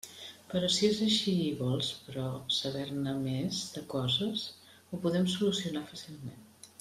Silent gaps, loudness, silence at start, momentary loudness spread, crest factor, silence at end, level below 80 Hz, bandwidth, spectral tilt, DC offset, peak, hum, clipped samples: none; -32 LUFS; 0.05 s; 17 LU; 18 dB; 0.15 s; -68 dBFS; 15 kHz; -5 dB/octave; under 0.1%; -16 dBFS; none; under 0.1%